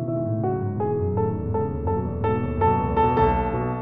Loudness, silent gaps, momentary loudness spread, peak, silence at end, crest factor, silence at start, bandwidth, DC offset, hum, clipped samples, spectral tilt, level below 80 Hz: -23 LUFS; none; 6 LU; -8 dBFS; 0 s; 16 dB; 0 s; 4.9 kHz; 0.6%; none; under 0.1%; -11.5 dB/octave; -36 dBFS